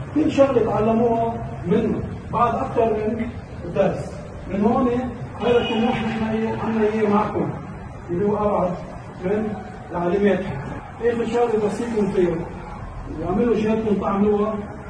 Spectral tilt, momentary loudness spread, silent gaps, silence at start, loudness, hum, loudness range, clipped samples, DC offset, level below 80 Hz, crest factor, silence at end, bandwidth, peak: -7.5 dB/octave; 12 LU; none; 0 s; -22 LUFS; none; 2 LU; under 0.1%; under 0.1%; -42 dBFS; 18 dB; 0 s; 10 kHz; -4 dBFS